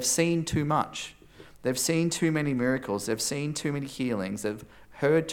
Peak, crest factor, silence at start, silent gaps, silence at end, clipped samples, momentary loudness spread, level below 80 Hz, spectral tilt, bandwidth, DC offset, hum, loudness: -10 dBFS; 18 dB; 0 s; none; 0 s; under 0.1%; 9 LU; -58 dBFS; -4.5 dB/octave; 18 kHz; under 0.1%; none; -28 LUFS